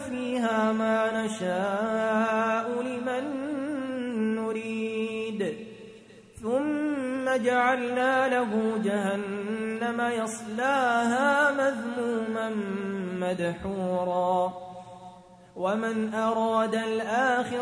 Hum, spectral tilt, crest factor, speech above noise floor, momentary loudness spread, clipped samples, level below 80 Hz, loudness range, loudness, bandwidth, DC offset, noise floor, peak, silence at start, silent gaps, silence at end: none; -5 dB/octave; 16 dB; 23 dB; 8 LU; under 0.1%; -64 dBFS; 4 LU; -27 LUFS; 10.5 kHz; under 0.1%; -50 dBFS; -10 dBFS; 0 s; none; 0 s